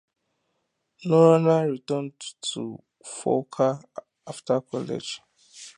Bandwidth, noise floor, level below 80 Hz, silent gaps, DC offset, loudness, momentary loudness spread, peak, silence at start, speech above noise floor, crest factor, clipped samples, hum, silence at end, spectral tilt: 10.5 kHz; -76 dBFS; -74 dBFS; none; under 0.1%; -24 LUFS; 22 LU; -4 dBFS; 1 s; 52 dB; 22 dB; under 0.1%; none; 0.05 s; -6 dB/octave